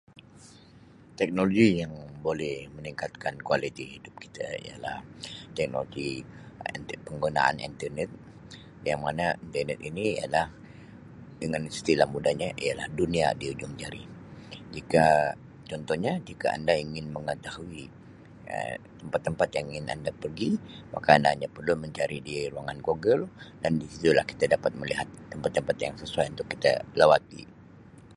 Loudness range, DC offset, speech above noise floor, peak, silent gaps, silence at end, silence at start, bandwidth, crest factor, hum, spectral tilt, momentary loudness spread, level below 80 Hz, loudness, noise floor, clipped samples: 7 LU; under 0.1%; 25 dB; -2 dBFS; none; 0 s; 0.15 s; 11.5 kHz; 26 dB; none; -5.5 dB/octave; 19 LU; -56 dBFS; -28 LUFS; -53 dBFS; under 0.1%